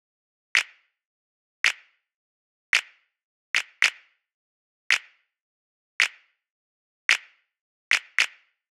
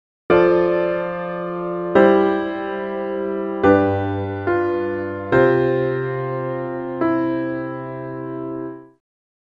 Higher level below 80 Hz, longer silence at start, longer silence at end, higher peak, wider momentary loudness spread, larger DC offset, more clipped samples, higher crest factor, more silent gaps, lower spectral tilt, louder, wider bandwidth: second, -80 dBFS vs -52 dBFS; first, 0.55 s vs 0.3 s; about the same, 0.45 s vs 0.55 s; about the same, -2 dBFS vs -2 dBFS; second, 4 LU vs 13 LU; neither; neither; first, 28 dB vs 18 dB; first, 1.05-1.64 s, 2.15-2.73 s, 3.23-3.54 s, 4.34-4.90 s, 5.41-5.99 s, 6.50-7.09 s, 7.61-7.91 s vs none; second, 4 dB/octave vs -9.5 dB/octave; second, -24 LUFS vs -20 LUFS; first, 18 kHz vs 5.2 kHz